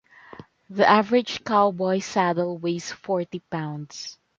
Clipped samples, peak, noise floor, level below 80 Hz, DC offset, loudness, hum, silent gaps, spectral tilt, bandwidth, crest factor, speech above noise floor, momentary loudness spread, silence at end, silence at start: under 0.1%; -2 dBFS; -46 dBFS; -66 dBFS; under 0.1%; -23 LUFS; none; none; -5 dB/octave; 7.6 kHz; 22 dB; 23 dB; 15 LU; 0.25 s; 0.4 s